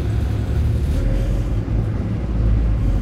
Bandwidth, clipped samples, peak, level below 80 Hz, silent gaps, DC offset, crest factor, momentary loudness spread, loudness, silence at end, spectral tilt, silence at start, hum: 8.6 kHz; under 0.1%; -6 dBFS; -20 dBFS; none; under 0.1%; 12 dB; 3 LU; -21 LUFS; 0 s; -8.5 dB/octave; 0 s; none